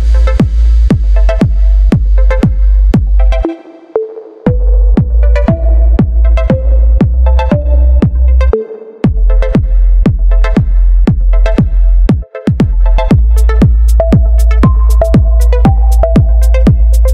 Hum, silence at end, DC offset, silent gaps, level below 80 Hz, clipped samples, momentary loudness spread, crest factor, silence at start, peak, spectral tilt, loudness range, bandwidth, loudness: none; 0 s; under 0.1%; none; -8 dBFS; under 0.1%; 4 LU; 6 dB; 0 s; 0 dBFS; -8.5 dB/octave; 3 LU; 5.4 kHz; -10 LUFS